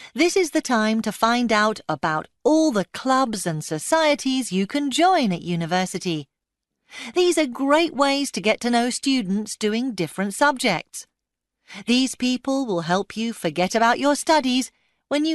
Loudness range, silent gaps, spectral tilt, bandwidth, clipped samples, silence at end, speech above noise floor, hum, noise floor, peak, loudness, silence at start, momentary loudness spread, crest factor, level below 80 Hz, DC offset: 3 LU; none; -4 dB/octave; 12.5 kHz; under 0.1%; 0 s; 61 dB; none; -83 dBFS; -4 dBFS; -21 LUFS; 0 s; 8 LU; 18 dB; -62 dBFS; under 0.1%